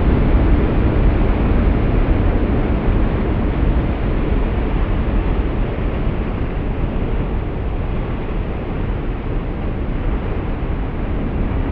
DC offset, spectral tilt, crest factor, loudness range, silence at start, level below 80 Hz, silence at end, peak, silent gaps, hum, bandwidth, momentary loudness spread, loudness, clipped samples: under 0.1%; -8 dB/octave; 14 dB; 6 LU; 0 s; -18 dBFS; 0 s; -4 dBFS; none; none; 4.5 kHz; 7 LU; -20 LUFS; under 0.1%